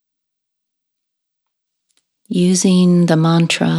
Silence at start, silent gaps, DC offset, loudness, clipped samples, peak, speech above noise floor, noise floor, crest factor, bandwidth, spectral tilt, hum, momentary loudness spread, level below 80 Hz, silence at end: 2.3 s; none; under 0.1%; -13 LUFS; under 0.1%; 0 dBFS; 65 dB; -77 dBFS; 16 dB; 12 kHz; -5.5 dB/octave; none; 5 LU; -66 dBFS; 0 s